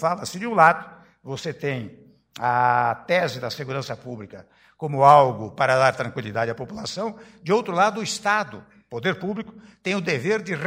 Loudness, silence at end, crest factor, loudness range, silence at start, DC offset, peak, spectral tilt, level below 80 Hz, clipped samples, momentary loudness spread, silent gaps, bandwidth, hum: -22 LUFS; 0 s; 22 dB; 4 LU; 0 s; under 0.1%; -2 dBFS; -5 dB/octave; -62 dBFS; under 0.1%; 17 LU; none; 16 kHz; none